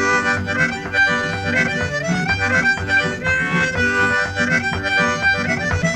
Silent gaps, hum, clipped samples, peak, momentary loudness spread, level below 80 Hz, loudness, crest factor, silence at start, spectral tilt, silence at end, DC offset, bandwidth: none; none; under 0.1%; -4 dBFS; 3 LU; -42 dBFS; -17 LUFS; 14 dB; 0 s; -4.5 dB/octave; 0 s; under 0.1%; 13 kHz